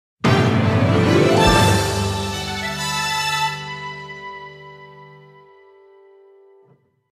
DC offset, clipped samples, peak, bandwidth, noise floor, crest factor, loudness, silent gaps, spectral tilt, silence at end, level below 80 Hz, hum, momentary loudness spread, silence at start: under 0.1%; under 0.1%; -2 dBFS; 15.5 kHz; -56 dBFS; 18 dB; -18 LUFS; none; -5 dB/octave; 2.05 s; -38 dBFS; none; 20 LU; 0.25 s